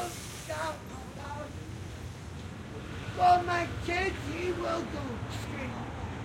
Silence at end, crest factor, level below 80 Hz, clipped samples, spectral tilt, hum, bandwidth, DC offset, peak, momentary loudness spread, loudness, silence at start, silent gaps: 0 s; 20 dB; -50 dBFS; under 0.1%; -5 dB/octave; none; 16.5 kHz; under 0.1%; -12 dBFS; 16 LU; -33 LUFS; 0 s; none